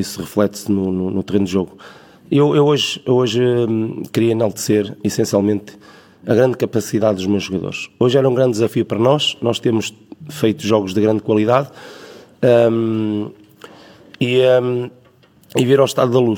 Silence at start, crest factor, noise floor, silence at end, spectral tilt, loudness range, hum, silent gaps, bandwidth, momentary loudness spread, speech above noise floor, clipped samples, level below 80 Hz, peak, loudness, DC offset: 0 s; 16 dB; -50 dBFS; 0 s; -6 dB/octave; 2 LU; none; none; 18 kHz; 10 LU; 34 dB; under 0.1%; -60 dBFS; 0 dBFS; -17 LUFS; under 0.1%